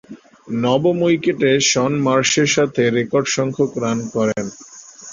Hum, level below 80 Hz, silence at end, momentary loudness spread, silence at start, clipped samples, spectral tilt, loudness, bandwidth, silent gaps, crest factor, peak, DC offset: none; -56 dBFS; 0 s; 12 LU; 0.1 s; under 0.1%; -4 dB/octave; -17 LUFS; 8 kHz; none; 16 dB; -2 dBFS; under 0.1%